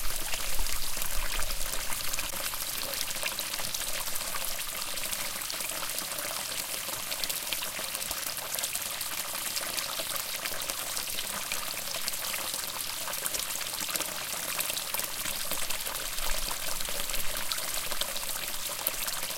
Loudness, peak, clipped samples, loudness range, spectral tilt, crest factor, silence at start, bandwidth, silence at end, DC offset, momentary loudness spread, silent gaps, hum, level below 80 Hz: -31 LUFS; -6 dBFS; under 0.1%; 1 LU; 0 dB/octave; 26 dB; 0 s; 17 kHz; 0 s; under 0.1%; 2 LU; none; none; -42 dBFS